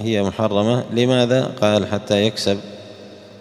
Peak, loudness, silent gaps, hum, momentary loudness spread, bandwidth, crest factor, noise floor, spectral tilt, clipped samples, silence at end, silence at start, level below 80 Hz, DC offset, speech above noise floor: -2 dBFS; -19 LUFS; none; none; 12 LU; 13.5 kHz; 18 dB; -39 dBFS; -5.5 dB/octave; under 0.1%; 0 s; 0 s; -58 dBFS; under 0.1%; 21 dB